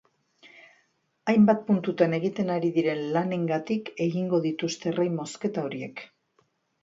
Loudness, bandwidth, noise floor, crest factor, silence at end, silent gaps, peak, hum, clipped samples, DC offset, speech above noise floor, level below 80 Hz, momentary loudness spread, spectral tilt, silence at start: -26 LUFS; 8 kHz; -70 dBFS; 20 dB; 0.8 s; none; -6 dBFS; none; under 0.1%; under 0.1%; 44 dB; -72 dBFS; 11 LU; -6.5 dB/octave; 0.45 s